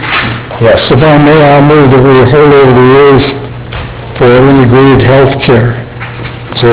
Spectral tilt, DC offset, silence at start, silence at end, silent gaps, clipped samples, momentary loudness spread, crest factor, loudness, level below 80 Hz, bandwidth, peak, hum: -11 dB/octave; 0.7%; 0 s; 0 s; none; 10%; 16 LU; 4 dB; -4 LUFS; -26 dBFS; 4 kHz; 0 dBFS; none